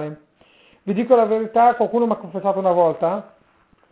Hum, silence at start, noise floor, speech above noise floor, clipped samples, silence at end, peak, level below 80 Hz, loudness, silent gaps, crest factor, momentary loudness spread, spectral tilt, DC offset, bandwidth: none; 0 s; -58 dBFS; 40 dB; under 0.1%; 0.65 s; -2 dBFS; -64 dBFS; -19 LUFS; none; 18 dB; 11 LU; -11 dB/octave; under 0.1%; 4 kHz